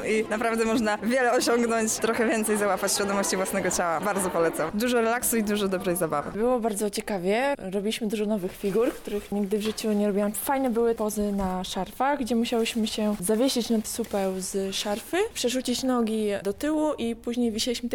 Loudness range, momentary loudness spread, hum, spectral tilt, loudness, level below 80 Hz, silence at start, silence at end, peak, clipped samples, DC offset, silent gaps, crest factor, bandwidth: 3 LU; 5 LU; none; -4 dB/octave; -26 LUFS; -52 dBFS; 0 s; 0 s; -14 dBFS; under 0.1%; under 0.1%; none; 12 dB; 20 kHz